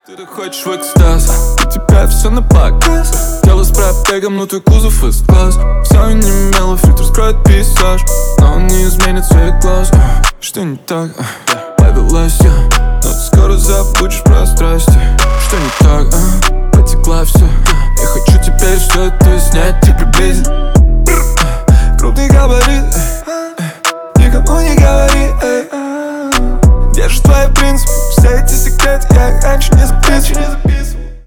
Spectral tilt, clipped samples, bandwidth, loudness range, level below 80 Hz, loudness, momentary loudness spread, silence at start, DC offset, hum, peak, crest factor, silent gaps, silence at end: -5 dB/octave; 0.5%; over 20 kHz; 2 LU; -8 dBFS; -10 LUFS; 7 LU; 0.1 s; under 0.1%; none; 0 dBFS; 8 dB; none; 0.05 s